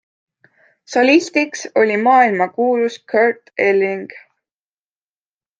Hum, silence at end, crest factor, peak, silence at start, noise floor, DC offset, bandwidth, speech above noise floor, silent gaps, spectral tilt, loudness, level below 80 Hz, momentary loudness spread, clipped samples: none; 1.4 s; 16 dB; 0 dBFS; 0.9 s; under -90 dBFS; under 0.1%; 9.2 kHz; over 75 dB; none; -4.5 dB/octave; -16 LUFS; -68 dBFS; 8 LU; under 0.1%